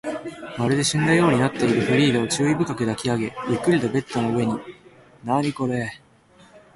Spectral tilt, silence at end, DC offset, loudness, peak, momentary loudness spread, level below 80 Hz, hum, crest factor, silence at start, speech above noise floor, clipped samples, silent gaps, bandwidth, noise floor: -5.5 dB/octave; 0.15 s; under 0.1%; -22 LUFS; -6 dBFS; 13 LU; -54 dBFS; none; 18 dB; 0.05 s; 32 dB; under 0.1%; none; 11.5 kHz; -53 dBFS